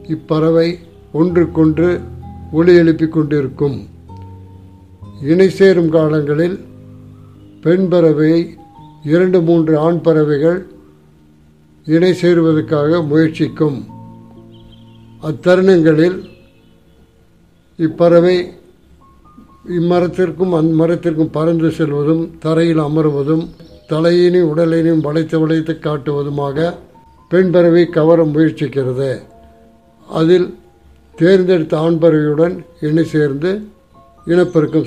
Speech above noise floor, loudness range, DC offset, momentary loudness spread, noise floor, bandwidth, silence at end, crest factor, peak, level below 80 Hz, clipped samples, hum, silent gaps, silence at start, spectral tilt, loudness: 37 dB; 2 LU; 0.2%; 13 LU; -50 dBFS; 9.4 kHz; 0 s; 14 dB; 0 dBFS; -46 dBFS; under 0.1%; none; none; 0 s; -8.5 dB/octave; -13 LUFS